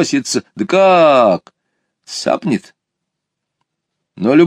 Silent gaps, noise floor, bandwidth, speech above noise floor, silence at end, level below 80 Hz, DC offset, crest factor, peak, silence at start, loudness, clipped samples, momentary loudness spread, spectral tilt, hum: none; -77 dBFS; 13.5 kHz; 65 dB; 0 s; -64 dBFS; under 0.1%; 14 dB; 0 dBFS; 0 s; -14 LUFS; under 0.1%; 13 LU; -5 dB/octave; none